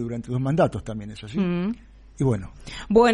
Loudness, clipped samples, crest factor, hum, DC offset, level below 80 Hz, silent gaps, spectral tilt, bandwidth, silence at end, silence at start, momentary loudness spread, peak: -25 LUFS; under 0.1%; 18 dB; none; under 0.1%; -44 dBFS; none; -7 dB/octave; 11 kHz; 0 s; 0 s; 14 LU; -6 dBFS